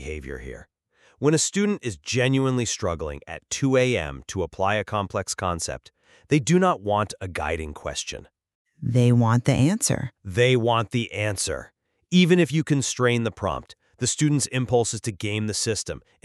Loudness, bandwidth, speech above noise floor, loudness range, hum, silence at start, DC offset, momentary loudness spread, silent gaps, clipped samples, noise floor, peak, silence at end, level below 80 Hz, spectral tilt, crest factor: -23 LUFS; 13 kHz; 38 dB; 3 LU; none; 0 s; under 0.1%; 13 LU; 8.55-8.65 s; under 0.1%; -61 dBFS; -6 dBFS; 0.25 s; -48 dBFS; -5 dB/octave; 18 dB